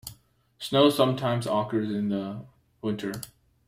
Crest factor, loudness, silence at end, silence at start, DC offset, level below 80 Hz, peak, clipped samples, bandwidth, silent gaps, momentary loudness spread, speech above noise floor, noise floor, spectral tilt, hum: 20 dB; -26 LUFS; 0.4 s; 0.05 s; under 0.1%; -62 dBFS; -6 dBFS; under 0.1%; 16 kHz; none; 18 LU; 31 dB; -57 dBFS; -6 dB/octave; none